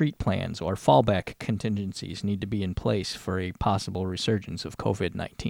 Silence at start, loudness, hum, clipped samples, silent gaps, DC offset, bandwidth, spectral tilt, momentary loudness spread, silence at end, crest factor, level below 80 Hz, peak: 0 s; -28 LUFS; none; under 0.1%; none; under 0.1%; 16.5 kHz; -6 dB/octave; 10 LU; 0 s; 20 dB; -46 dBFS; -8 dBFS